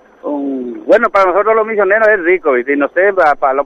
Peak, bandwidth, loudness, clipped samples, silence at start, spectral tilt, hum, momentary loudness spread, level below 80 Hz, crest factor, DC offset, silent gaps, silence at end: 0 dBFS; 7.8 kHz; -12 LUFS; under 0.1%; 0.25 s; -6 dB/octave; none; 10 LU; -50 dBFS; 12 dB; under 0.1%; none; 0 s